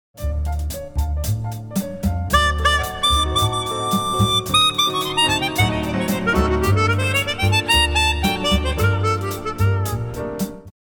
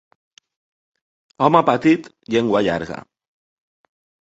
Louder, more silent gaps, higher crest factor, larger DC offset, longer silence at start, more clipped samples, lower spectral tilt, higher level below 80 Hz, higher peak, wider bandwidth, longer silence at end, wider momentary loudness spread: about the same, -19 LUFS vs -18 LUFS; neither; about the same, 18 dB vs 22 dB; neither; second, 0.15 s vs 1.4 s; neither; second, -4 dB/octave vs -6.5 dB/octave; first, -28 dBFS vs -56 dBFS; about the same, -2 dBFS vs 0 dBFS; first, 19 kHz vs 8 kHz; second, 0.1 s vs 1.2 s; about the same, 11 LU vs 12 LU